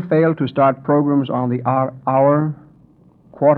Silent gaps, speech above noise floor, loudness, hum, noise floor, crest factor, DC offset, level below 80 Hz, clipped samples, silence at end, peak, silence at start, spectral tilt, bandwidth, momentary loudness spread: none; 34 dB; -17 LUFS; none; -50 dBFS; 14 dB; under 0.1%; -62 dBFS; under 0.1%; 0 s; -2 dBFS; 0 s; -11.5 dB/octave; 4.4 kHz; 5 LU